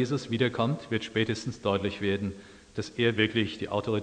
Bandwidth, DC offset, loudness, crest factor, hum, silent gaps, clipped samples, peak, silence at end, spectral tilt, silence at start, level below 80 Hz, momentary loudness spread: 10 kHz; under 0.1%; -29 LUFS; 20 dB; none; none; under 0.1%; -8 dBFS; 0 s; -6 dB/octave; 0 s; -60 dBFS; 11 LU